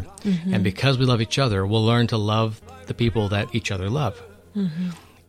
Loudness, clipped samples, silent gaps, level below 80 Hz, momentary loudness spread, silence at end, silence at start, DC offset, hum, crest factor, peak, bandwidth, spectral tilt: -23 LUFS; under 0.1%; none; -48 dBFS; 11 LU; 0.3 s; 0 s; under 0.1%; none; 16 dB; -6 dBFS; 13.5 kHz; -6 dB/octave